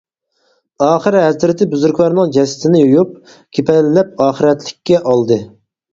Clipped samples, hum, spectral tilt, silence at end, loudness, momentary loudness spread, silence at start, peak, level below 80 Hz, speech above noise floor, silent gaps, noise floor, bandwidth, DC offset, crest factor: under 0.1%; none; -6.5 dB/octave; 0.45 s; -13 LUFS; 6 LU; 0.8 s; 0 dBFS; -54 dBFS; 49 dB; none; -61 dBFS; 7.8 kHz; under 0.1%; 14 dB